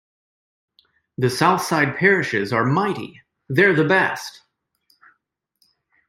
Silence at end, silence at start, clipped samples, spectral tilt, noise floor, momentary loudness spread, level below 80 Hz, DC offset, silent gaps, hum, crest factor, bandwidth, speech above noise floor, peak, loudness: 1.8 s; 1.2 s; under 0.1%; -5.5 dB/octave; -72 dBFS; 15 LU; -62 dBFS; under 0.1%; none; none; 20 dB; 16 kHz; 53 dB; -2 dBFS; -19 LUFS